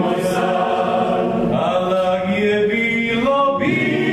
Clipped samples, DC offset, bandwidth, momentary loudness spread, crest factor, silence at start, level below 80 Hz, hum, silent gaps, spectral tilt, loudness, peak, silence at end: under 0.1%; under 0.1%; 14.5 kHz; 2 LU; 14 dB; 0 s; -48 dBFS; none; none; -6 dB/octave; -18 LUFS; -4 dBFS; 0 s